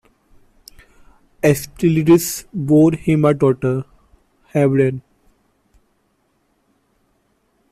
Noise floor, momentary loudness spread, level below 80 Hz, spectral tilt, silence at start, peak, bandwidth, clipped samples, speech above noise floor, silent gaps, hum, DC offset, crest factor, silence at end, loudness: -64 dBFS; 11 LU; -50 dBFS; -7 dB/octave; 1.45 s; -2 dBFS; 15.5 kHz; under 0.1%; 49 dB; none; none; under 0.1%; 16 dB; 2.7 s; -16 LUFS